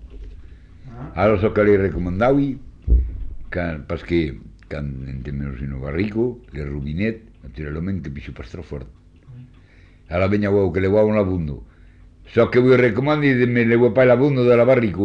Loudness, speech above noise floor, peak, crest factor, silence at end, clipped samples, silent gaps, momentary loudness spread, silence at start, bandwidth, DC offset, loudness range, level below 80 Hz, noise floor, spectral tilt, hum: -19 LUFS; 29 dB; -4 dBFS; 16 dB; 0 s; under 0.1%; none; 19 LU; 0 s; 7 kHz; under 0.1%; 10 LU; -32 dBFS; -48 dBFS; -9 dB/octave; none